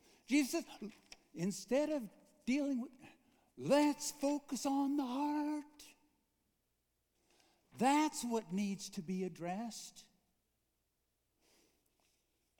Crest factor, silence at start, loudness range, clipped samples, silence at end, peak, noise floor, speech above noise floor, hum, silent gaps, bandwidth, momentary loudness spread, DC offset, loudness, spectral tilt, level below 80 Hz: 22 dB; 0.3 s; 8 LU; under 0.1%; 2.6 s; -18 dBFS; -84 dBFS; 46 dB; none; none; 19 kHz; 17 LU; under 0.1%; -38 LUFS; -4.5 dB/octave; -80 dBFS